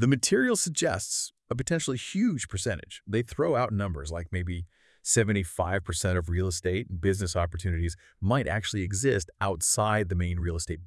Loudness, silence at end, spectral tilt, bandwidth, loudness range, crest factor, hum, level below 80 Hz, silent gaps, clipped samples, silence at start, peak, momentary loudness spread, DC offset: -28 LUFS; 0 s; -4.5 dB/octave; 12 kHz; 2 LU; 18 dB; none; -48 dBFS; none; under 0.1%; 0 s; -10 dBFS; 9 LU; under 0.1%